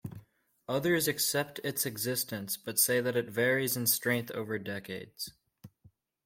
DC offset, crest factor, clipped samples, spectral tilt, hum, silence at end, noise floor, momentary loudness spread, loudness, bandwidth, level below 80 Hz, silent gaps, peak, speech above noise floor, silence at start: under 0.1%; 20 dB; under 0.1%; -3 dB/octave; none; 0.6 s; -64 dBFS; 14 LU; -30 LUFS; 16.5 kHz; -70 dBFS; none; -12 dBFS; 33 dB; 0.05 s